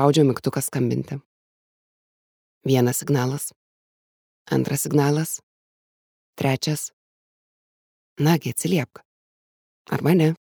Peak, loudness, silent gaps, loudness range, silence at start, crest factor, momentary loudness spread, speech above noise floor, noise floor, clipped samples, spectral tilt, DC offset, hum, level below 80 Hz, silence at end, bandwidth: -2 dBFS; -23 LUFS; 1.26-2.61 s, 3.56-4.45 s, 5.43-6.33 s, 6.93-8.16 s, 9.05-9.85 s; 3 LU; 0 s; 22 dB; 13 LU; over 69 dB; under -90 dBFS; under 0.1%; -5.5 dB/octave; under 0.1%; none; -66 dBFS; 0.25 s; over 20 kHz